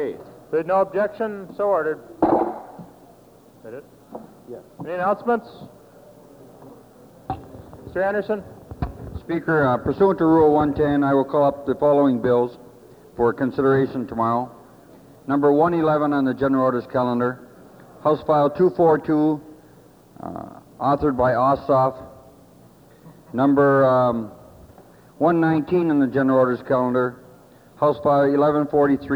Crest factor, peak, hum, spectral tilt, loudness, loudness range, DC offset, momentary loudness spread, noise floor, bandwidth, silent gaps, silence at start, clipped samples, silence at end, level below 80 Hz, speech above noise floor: 16 dB; -6 dBFS; none; -9 dB/octave; -20 LUFS; 10 LU; under 0.1%; 20 LU; -50 dBFS; 18.5 kHz; none; 0 s; under 0.1%; 0 s; -50 dBFS; 30 dB